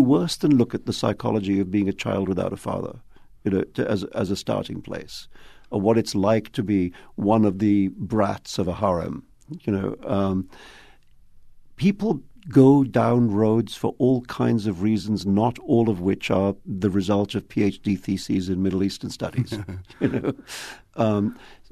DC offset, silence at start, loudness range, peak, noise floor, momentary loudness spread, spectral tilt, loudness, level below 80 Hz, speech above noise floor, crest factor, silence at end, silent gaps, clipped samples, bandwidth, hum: under 0.1%; 0 s; 7 LU; -4 dBFS; -50 dBFS; 11 LU; -7 dB/octave; -23 LUFS; -52 dBFS; 27 dB; 20 dB; 0.2 s; none; under 0.1%; 13.5 kHz; none